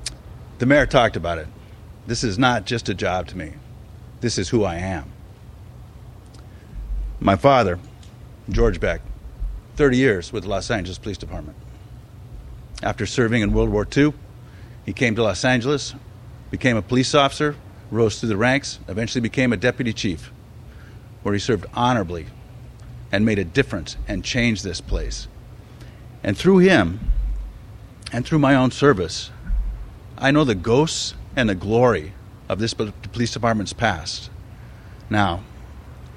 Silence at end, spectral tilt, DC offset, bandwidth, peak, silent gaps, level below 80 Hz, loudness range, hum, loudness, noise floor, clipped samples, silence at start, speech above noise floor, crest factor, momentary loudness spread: 0 s; -5.5 dB/octave; under 0.1%; 13 kHz; 0 dBFS; none; -34 dBFS; 5 LU; none; -21 LUFS; -41 dBFS; under 0.1%; 0 s; 21 dB; 22 dB; 24 LU